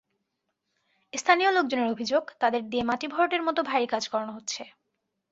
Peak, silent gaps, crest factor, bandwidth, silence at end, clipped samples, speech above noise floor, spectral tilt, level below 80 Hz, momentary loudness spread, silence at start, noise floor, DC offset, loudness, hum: -6 dBFS; none; 22 dB; 8 kHz; 0.65 s; under 0.1%; 54 dB; -2.5 dB/octave; -68 dBFS; 12 LU; 1.15 s; -80 dBFS; under 0.1%; -26 LUFS; none